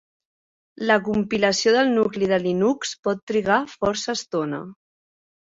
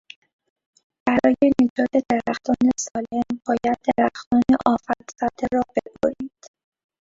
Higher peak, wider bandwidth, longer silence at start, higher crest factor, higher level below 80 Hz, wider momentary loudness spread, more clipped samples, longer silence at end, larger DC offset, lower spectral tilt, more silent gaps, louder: about the same, -4 dBFS vs -2 dBFS; about the same, 8 kHz vs 7.8 kHz; second, 0.8 s vs 1.05 s; about the same, 18 dB vs 20 dB; about the same, -58 dBFS vs -54 dBFS; about the same, 9 LU vs 9 LU; neither; about the same, 0.7 s vs 0.75 s; neither; about the same, -4 dB/octave vs -5 dB/octave; about the same, 2.99-3.03 s, 3.22-3.27 s vs 1.70-1.76 s, 4.26-4.31 s; about the same, -22 LUFS vs -21 LUFS